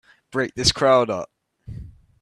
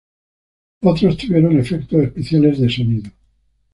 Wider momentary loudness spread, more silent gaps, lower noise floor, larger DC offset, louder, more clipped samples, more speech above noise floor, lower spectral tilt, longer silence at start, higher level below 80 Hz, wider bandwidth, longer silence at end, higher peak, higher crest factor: first, 22 LU vs 5 LU; neither; second, -39 dBFS vs -60 dBFS; neither; second, -20 LUFS vs -16 LUFS; neither; second, 19 dB vs 45 dB; second, -3.5 dB/octave vs -8.5 dB/octave; second, 0.35 s vs 0.8 s; about the same, -44 dBFS vs -44 dBFS; first, 13 kHz vs 11 kHz; second, 0.3 s vs 0.65 s; about the same, -2 dBFS vs -2 dBFS; first, 20 dB vs 14 dB